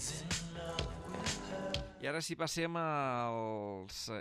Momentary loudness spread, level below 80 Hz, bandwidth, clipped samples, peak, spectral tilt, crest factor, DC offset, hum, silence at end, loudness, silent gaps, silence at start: 7 LU; -54 dBFS; 15 kHz; under 0.1%; -20 dBFS; -3.5 dB/octave; 18 dB; under 0.1%; none; 0 s; -39 LUFS; none; 0 s